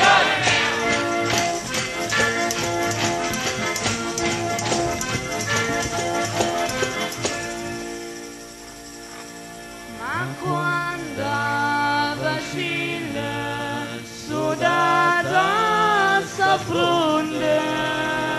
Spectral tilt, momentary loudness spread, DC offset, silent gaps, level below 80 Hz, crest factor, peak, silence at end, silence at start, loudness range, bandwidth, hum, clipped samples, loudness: -3 dB/octave; 15 LU; under 0.1%; none; -50 dBFS; 18 dB; -4 dBFS; 0 s; 0 s; 9 LU; 12.5 kHz; none; under 0.1%; -21 LUFS